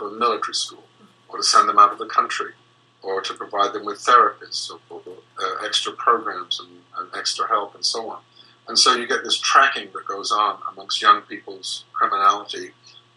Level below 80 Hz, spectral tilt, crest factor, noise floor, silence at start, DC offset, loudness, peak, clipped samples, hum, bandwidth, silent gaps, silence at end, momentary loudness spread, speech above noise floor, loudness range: -82 dBFS; 0 dB/octave; 20 dB; -47 dBFS; 0 s; under 0.1%; -20 LUFS; 0 dBFS; under 0.1%; none; 12 kHz; none; 0.45 s; 18 LU; 26 dB; 5 LU